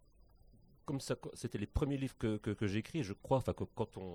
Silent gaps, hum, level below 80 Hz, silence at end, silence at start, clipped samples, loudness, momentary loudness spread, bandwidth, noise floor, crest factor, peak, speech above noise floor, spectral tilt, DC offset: none; none; -52 dBFS; 0 s; 0.9 s; under 0.1%; -39 LUFS; 7 LU; 15 kHz; -65 dBFS; 20 dB; -20 dBFS; 26 dB; -6.5 dB/octave; under 0.1%